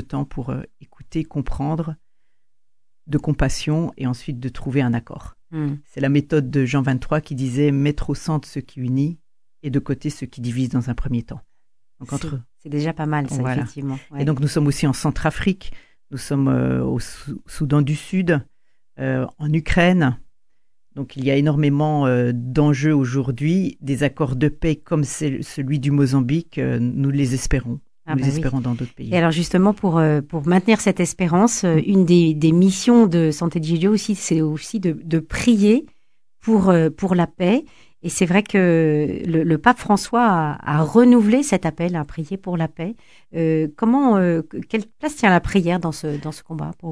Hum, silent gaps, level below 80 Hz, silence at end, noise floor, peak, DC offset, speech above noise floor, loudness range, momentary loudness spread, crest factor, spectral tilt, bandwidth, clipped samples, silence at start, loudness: none; none; -38 dBFS; 0 s; -82 dBFS; 0 dBFS; 0.4%; 63 dB; 8 LU; 13 LU; 20 dB; -6.5 dB/octave; 11 kHz; under 0.1%; 0 s; -20 LUFS